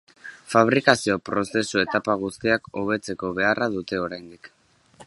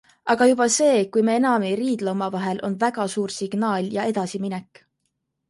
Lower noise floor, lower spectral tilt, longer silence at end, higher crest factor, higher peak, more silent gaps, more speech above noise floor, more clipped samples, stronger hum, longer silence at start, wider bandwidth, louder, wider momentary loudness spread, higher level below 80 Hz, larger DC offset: second, -52 dBFS vs -76 dBFS; about the same, -4.5 dB/octave vs -4.5 dB/octave; second, 0.05 s vs 0.85 s; first, 24 dB vs 18 dB; first, 0 dBFS vs -6 dBFS; neither; second, 29 dB vs 54 dB; neither; neither; about the same, 0.25 s vs 0.25 s; about the same, 11.5 kHz vs 11.5 kHz; about the same, -23 LUFS vs -22 LUFS; about the same, 10 LU vs 9 LU; first, -58 dBFS vs -68 dBFS; neither